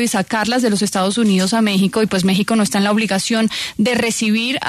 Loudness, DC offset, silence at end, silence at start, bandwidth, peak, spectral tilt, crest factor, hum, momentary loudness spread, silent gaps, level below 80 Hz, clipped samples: -16 LUFS; under 0.1%; 0 s; 0 s; 13.5 kHz; -4 dBFS; -4 dB/octave; 12 dB; none; 2 LU; none; -52 dBFS; under 0.1%